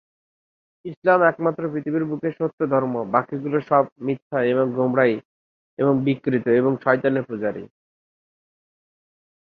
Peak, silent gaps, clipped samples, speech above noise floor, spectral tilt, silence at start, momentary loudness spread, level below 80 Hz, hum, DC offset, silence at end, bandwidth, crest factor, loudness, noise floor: -2 dBFS; 0.97-1.02 s, 2.53-2.58 s, 3.92-3.96 s, 4.22-4.30 s, 5.25-5.77 s; under 0.1%; over 69 dB; -10 dB/octave; 0.85 s; 9 LU; -66 dBFS; none; under 0.1%; 1.9 s; 5 kHz; 20 dB; -22 LUFS; under -90 dBFS